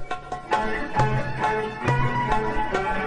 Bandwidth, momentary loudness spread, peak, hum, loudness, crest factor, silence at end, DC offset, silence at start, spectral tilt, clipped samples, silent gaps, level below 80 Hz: 10 kHz; 3 LU; -6 dBFS; none; -25 LUFS; 16 dB; 0 s; under 0.1%; 0 s; -6.5 dB/octave; under 0.1%; none; -36 dBFS